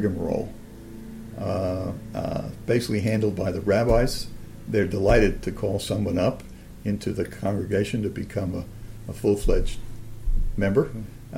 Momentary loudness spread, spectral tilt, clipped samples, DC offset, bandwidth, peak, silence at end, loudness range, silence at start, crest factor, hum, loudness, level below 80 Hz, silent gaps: 18 LU; -6.5 dB/octave; under 0.1%; under 0.1%; 16 kHz; -6 dBFS; 0 s; 4 LU; 0 s; 18 dB; none; -26 LUFS; -32 dBFS; none